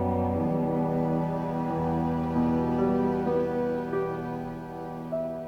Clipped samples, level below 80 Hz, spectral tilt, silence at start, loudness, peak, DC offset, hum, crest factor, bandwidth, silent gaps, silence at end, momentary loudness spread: under 0.1%; -52 dBFS; -9.5 dB/octave; 0 s; -28 LUFS; -14 dBFS; under 0.1%; none; 14 dB; 6.8 kHz; none; 0 s; 9 LU